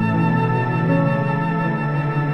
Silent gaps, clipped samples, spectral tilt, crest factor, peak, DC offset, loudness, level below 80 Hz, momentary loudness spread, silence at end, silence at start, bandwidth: none; under 0.1%; -9.5 dB/octave; 12 dB; -6 dBFS; 0.7%; -19 LUFS; -48 dBFS; 3 LU; 0 s; 0 s; 5.6 kHz